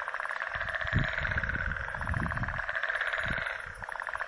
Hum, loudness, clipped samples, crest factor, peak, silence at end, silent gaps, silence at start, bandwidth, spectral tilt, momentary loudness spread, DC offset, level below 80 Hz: none; -32 LUFS; under 0.1%; 18 dB; -16 dBFS; 0 s; none; 0 s; 11.5 kHz; -5.5 dB/octave; 6 LU; under 0.1%; -44 dBFS